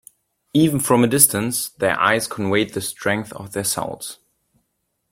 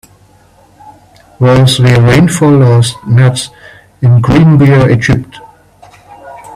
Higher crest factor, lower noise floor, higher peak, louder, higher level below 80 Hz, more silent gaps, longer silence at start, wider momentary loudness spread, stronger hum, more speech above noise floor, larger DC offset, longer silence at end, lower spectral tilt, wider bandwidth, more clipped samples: first, 20 dB vs 8 dB; first, -73 dBFS vs -43 dBFS; about the same, 0 dBFS vs 0 dBFS; second, -19 LUFS vs -7 LUFS; second, -56 dBFS vs -34 dBFS; neither; second, 0.55 s vs 0.85 s; first, 12 LU vs 8 LU; second, none vs 50 Hz at -35 dBFS; first, 53 dB vs 37 dB; neither; first, 1 s vs 0 s; second, -3.5 dB/octave vs -6.5 dB/octave; first, 16.5 kHz vs 13 kHz; neither